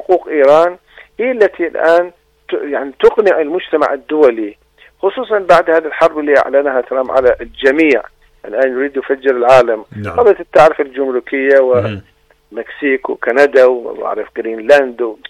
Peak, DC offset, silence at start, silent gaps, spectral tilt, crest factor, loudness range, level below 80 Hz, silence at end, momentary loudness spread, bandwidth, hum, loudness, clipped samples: 0 dBFS; under 0.1%; 0 s; none; -6 dB/octave; 12 dB; 2 LU; -48 dBFS; 0 s; 12 LU; 10.5 kHz; none; -12 LUFS; 0.2%